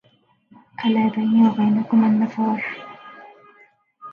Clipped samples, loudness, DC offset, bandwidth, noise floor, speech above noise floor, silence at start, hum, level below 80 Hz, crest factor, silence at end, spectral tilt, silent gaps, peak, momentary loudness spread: under 0.1%; -19 LUFS; under 0.1%; 4.5 kHz; -60 dBFS; 43 dB; 0.8 s; none; -70 dBFS; 16 dB; 0 s; -8.5 dB/octave; none; -6 dBFS; 20 LU